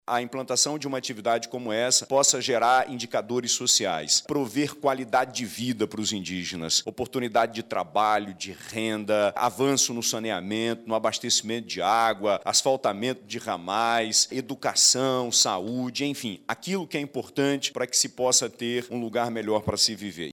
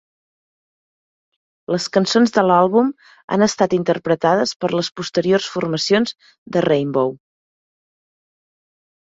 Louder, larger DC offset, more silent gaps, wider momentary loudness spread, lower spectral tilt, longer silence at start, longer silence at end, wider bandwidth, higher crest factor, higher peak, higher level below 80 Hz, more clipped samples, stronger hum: second, -25 LUFS vs -18 LUFS; neither; second, none vs 3.24-3.28 s, 4.56-4.60 s, 6.38-6.46 s; about the same, 10 LU vs 9 LU; second, -2 dB/octave vs -5 dB/octave; second, 0.1 s vs 1.7 s; second, 0 s vs 2 s; first, 18 kHz vs 8 kHz; about the same, 16 dB vs 18 dB; second, -10 dBFS vs -2 dBFS; about the same, -66 dBFS vs -62 dBFS; neither; neither